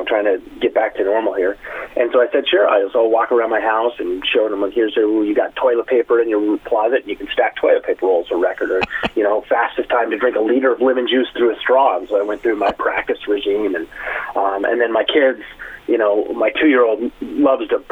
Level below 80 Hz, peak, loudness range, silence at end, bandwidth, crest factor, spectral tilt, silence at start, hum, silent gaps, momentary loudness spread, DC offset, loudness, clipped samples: -50 dBFS; -2 dBFS; 2 LU; 0.1 s; 4.7 kHz; 14 dB; -5.5 dB/octave; 0 s; none; none; 6 LU; under 0.1%; -17 LUFS; under 0.1%